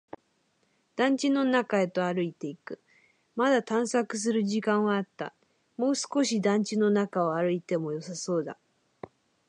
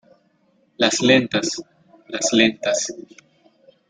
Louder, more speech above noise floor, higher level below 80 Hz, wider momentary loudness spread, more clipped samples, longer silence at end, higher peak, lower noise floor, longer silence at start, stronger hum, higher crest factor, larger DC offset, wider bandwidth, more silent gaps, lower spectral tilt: second, -28 LUFS vs -19 LUFS; about the same, 44 dB vs 43 dB; second, -80 dBFS vs -62 dBFS; first, 18 LU vs 15 LU; neither; about the same, 0.95 s vs 0.9 s; second, -12 dBFS vs 0 dBFS; first, -71 dBFS vs -62 dBFS; first, 0.95 s vs 0.8 s; neither; second, 16 dB vs 22 dB; neither; first, 11 kHz vs 9.6 kHz; neither; first, -5 dB/octave vs -3 dB/octave